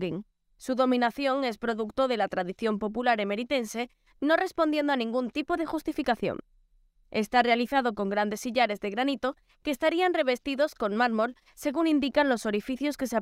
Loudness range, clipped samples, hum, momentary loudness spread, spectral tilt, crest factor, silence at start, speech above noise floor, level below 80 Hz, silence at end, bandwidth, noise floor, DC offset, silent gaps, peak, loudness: 2 LU; under 0.1%; none; 9 LU; -4.5 dB/octave; 18 dB; 0 s; 36 dB; -60 dBFS; 0 s; 16 kHz; -64 dBFS; under 0.1%; none; -10 dBFS; -28 LUFS